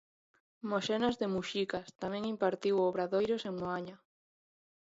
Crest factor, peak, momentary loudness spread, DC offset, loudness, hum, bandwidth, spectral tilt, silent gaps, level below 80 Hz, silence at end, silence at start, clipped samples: 18 dB; -18 dBFS; 8 LU; under 0.1%; -34 LUFS; none; 7.8 kHz; -5.5 dB/octave; none; -70 dBFS; 0.9 s; 0.65 s; under 0.1%